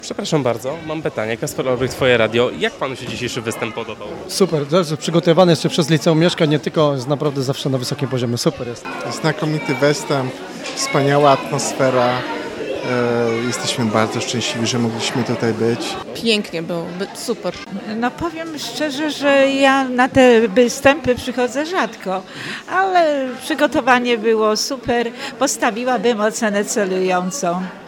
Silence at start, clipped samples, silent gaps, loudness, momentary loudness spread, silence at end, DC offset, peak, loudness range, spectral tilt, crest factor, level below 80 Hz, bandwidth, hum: 0 s; under 0.1%; none; -18 LUFS; 11 LU; 0 s; under 0.1%; 0 dBFS; 5 LU; -4.5 dB/octave; 18 dB; -52 dBFS; 18 kHz; none